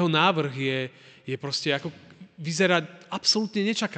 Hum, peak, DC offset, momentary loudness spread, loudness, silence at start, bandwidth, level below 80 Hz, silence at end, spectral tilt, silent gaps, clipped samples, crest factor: none; -8 dBFS; under 0.1%; 14 LU; -25 LUFS; 0 s; 9.2 kHz; -74 dBFS; 0 s; -4 dB/octave; none; under 0.1%; 18 dB